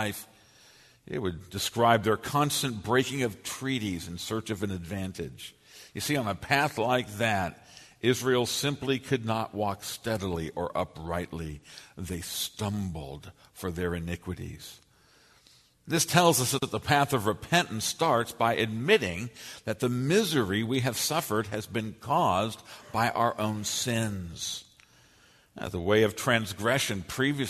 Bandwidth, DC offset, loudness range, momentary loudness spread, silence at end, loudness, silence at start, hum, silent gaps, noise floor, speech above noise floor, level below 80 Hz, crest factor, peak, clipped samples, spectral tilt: 13.5 kHz; under 0.1%; 8 LU; 14 LU; 0 s; -29 LUFS; 0 s; none; none; -61 dBFS; 32 dB; -56 dBFS; 24 dB; -6 dBFS; under 0.1%; -4 dB/octave